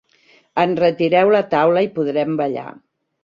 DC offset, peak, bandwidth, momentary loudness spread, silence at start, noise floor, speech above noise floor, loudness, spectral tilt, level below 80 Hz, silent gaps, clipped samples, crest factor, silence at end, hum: under 0.1%; -2 dBFS; 7 kHz; 11 LU; 0.55 s; -55 dBFS; 38 dB; -17 LUFS; -8 dB/octave; -62 dBFS; none; under 0.1%; 16 dB; 0.55 s; none